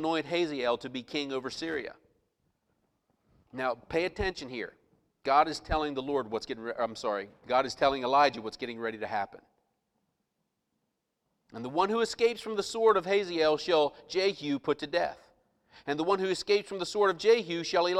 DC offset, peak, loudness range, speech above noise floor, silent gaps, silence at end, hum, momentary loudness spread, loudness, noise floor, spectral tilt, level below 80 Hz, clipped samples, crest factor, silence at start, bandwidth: under 0.1%; -10 dBFS; 9 LU; 52 dB; none; 0 s; none; 12 LU; -30 LUFS; -82 dBFS; -4 dB/octave; -56 dBFS; under 0.1%; 22 dB; 0 s; 12.5 kHz